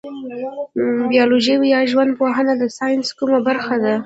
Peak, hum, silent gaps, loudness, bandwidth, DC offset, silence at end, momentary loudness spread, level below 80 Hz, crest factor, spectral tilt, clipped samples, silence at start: -2 dBFS; none; none; -17 LUFS; 8 kHz; under 0.1%; 0 s; 11 LU; -62 dBFS; 16 dB; -4.5 dB/octave; under 0.1%; 0.05 s